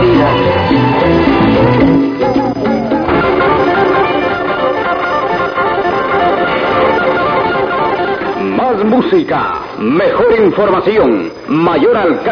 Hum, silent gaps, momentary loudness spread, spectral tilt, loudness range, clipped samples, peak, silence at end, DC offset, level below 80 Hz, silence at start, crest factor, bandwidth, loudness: none; none; 5 LU; -8 dB/octave; 2 LU; under 0.1%; 0 dBFS; 0 s; under 0.1%; -34 dBFS; 0 s; 10 dB; 5.4 kHz; -11 LUFS